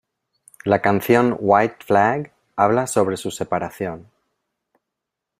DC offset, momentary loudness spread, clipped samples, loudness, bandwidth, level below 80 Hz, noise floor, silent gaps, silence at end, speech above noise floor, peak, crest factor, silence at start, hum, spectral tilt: under 0.1%; 13 LU; under 0.1%; -19 LUFS; 16 kHz; -60 dBFS; -82 dBFS; none; 1.35 s; 64 dB; -2 dBFS; 20 dB; 0.65 s; none; -5.5 dB/octave